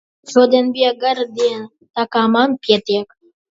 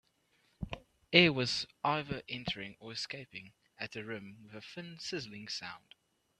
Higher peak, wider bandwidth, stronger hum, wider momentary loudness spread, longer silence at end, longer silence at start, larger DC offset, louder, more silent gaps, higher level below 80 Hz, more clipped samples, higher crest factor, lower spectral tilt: first, 0 dBFS vs -6 dBFS; second, 7.8 kHz vs 11.5 kHz; neither; second, 10 LU vs 21 LU; second, 0.45 s vs 0.6 s; second, 0.25 s vs 0.6 s; neither; first, -16 LUFS vs -34 LUFS; first, 1.90-1.94 s vs none; about the same, -66 dBFS vs -62 dBFS; neither; second, 16 dB vs 30 dB; about the same, -4.5 dB/octave vs -4.5 dB/octave